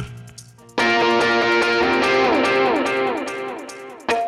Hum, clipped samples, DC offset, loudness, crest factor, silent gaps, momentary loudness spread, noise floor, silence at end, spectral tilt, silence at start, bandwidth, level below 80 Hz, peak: none; under 0.1%; under 0.1%; -18 LUFS; 12 dB; none; 15 LU; -43 dBFS; 0 s; -4 dB/octave; 0 s; 13.5 kHz; -52 dBFS; -8 dBFS